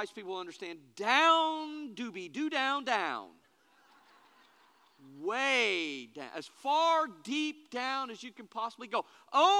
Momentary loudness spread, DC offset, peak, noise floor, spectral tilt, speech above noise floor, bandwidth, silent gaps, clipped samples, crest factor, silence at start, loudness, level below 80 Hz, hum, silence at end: 16 LU; under 0.1%; -12 dBFS; -66 dBFS; -2 dB/octave; 34 dB; 13.5 kHz; none; under 0.1%; 22 dB; 0 s; -32 LUFS; under -90 dBFS; none; 0 s